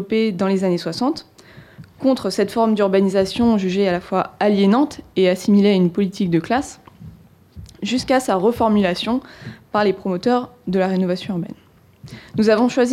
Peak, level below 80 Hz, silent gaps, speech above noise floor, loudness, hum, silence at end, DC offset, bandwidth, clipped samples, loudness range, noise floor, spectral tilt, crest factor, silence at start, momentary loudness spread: -6 dBFS; -52 dBFS; none; 26 dB; -19 LUFS; none; 0 s; under 0.1%; 13.5 kHz; under 0.1%; 4 LU; -44 dBFS; -6.5 dB/octave; 14 dB; 0 s; 9 LU